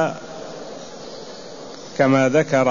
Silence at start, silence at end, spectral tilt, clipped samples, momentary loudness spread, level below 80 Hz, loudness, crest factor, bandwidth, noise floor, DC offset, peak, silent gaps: 0 s; 0 s; -6 dB/octave; under 0.1%; 19 LU; -60 dBFS; -18 LUFS; 18 dB; 7.4 kHz; -36 dBFS; 0.6%; -4 dBFS; none